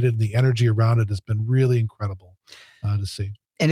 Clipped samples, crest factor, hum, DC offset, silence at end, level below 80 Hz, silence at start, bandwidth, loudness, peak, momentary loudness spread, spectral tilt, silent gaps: under 0.1%; 14 dB; none; under 0.1%; 0 s; -56 dBFS; 0 s; 11 kHz; -22 LUFS; -6 dBFS; 12 LU; -7.5 dB/octave; none